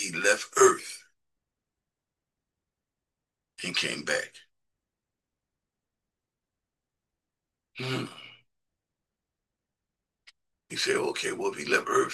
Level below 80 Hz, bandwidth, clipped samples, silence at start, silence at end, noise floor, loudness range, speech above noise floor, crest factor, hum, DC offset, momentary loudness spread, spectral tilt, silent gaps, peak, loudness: -78 dBFS; 12.5 kHz; under 0.1%; 0 s; 0 s; -88 dBFS; 11 LU; 61 dB; 26 dB; none; under 0.1%; 20 LU; -2.5 dB/octave; none; -8 dBFS; -27 LUFS